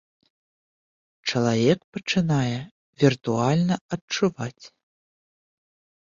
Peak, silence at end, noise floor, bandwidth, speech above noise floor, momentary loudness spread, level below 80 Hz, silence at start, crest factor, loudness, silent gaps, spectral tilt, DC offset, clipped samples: -6 dBFS; 1.35 s; under -90 dBFS; 7.6 kHz; over 67 dB; 11 LU; -60 dBFS; 1.25 s; 20 dB; -24 LUFS; 1.84-1.93 s, 2.71-2.93 s, 3.81-3.89 s, 4.01-4.08 s; -6 dB/octave; under 0.1%; under 0.1%